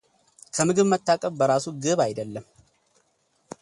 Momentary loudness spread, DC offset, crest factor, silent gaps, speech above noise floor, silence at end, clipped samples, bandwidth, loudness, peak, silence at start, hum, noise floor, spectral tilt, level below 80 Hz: 14 LU; under 0.1%; 18 dB; none; 45 dB; 1.2 s; under 0.1%; 11.5 kHz; -23 LUFS; -6 dBFS; 0.55 s; none; -68 dBFS; -4.5 dB/octave; -66 dBFS